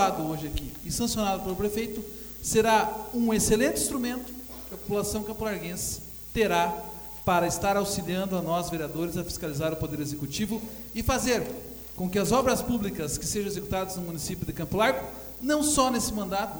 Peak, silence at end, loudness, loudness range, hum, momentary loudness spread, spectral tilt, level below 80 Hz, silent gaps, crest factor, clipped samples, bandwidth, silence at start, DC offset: -8 dBFS; 0 s; -28 LUFS; 4 LU; none; 11 LU; -4 dB/octave; -44 dBFS; none; 20 dB; under 0.1%; over 20 kHz; 0 s; under 0.1%